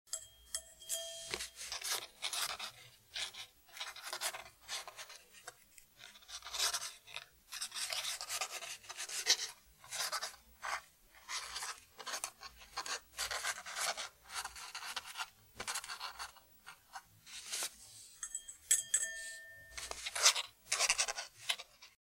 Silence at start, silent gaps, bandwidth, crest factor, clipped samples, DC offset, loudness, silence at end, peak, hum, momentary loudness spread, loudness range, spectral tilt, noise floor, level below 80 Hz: 0.05 s; none; 16 kHz; 30 dB; under 0.1%; under 0.1%; -39 LUFS; 0.2 s; -12 dBFS; none; 19 LU; 10 LU; 2 dB/octave; -63 dBFS; -72 dBFS